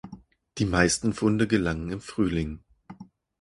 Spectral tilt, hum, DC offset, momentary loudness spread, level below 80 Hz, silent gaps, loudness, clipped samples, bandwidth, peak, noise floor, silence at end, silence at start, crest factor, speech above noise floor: -5 dB/octave; none; under 0.1%; 18 LU; -44 dBFS; none; -26 LUFS; under 0.1%; 11.5 kHz; -4 dBFS; -49 dBFS; 0.35 s; 0.05 s; 22 dB; 23 dB